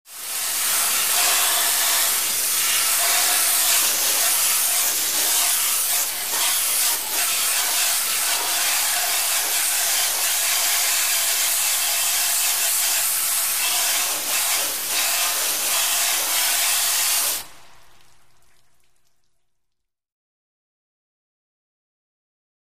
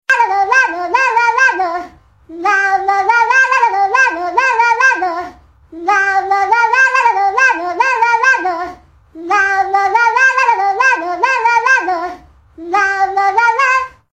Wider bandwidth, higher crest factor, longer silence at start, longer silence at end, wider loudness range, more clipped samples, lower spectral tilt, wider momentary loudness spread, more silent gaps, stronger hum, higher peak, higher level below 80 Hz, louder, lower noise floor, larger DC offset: first, 15.5 kHz vs 11 kHz; about the same, 16 dB vs 12 dB; about the same, 0.05 s vs 0.1 s; first, 2.6 s vs 0.25 s; about the same, 3 LU vs 1 LU; neither; second, 3 dB/octave vs -1.5 dB/octave; second, 4 LU vs 10 LU; neither; neither; second, -6 dBFS vs 0 dBFS; second, -62 dBFS vs -52 dBFS; second, -18 LUFS vs -12 LUFS; first, -78 dBFS vs -37 dBFS; first, 0.8% vs under 0.1%